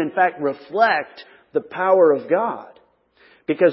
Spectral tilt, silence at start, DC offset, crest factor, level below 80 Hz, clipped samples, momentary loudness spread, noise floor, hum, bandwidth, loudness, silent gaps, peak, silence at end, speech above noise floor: -10 dB/octave; 0 s; under 0.1%; 18 dB; -72 dBFS; under 0.1%; 14 LU; -56 dBFS; none; 5.8 kHz; -20 LUFS; none; -2 dBFS; 0 s; 37 dB